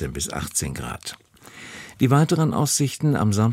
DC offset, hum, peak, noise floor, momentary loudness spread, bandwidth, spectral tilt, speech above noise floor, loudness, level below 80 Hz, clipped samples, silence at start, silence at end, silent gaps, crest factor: under 0.1%; none; -6 dBFS; -44 dBFS; 19 LU; 16 kHz; -5 dB/octave; 22 dB; -22 LUFS; -44 dBFS; under 0.1%; 0 s; 0 s; none; 16 dB